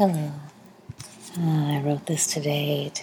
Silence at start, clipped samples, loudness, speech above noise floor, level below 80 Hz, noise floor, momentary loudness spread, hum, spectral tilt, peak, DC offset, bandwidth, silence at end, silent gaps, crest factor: 0 s; under 0.1%; -25 LUFS; 20 dB; -68 dBFS; -45 dBFS; 18 LU; none; -5 dB/octave; -8 dBFS; under 0.1%; 18 kHz; 0 s; none; 18 dB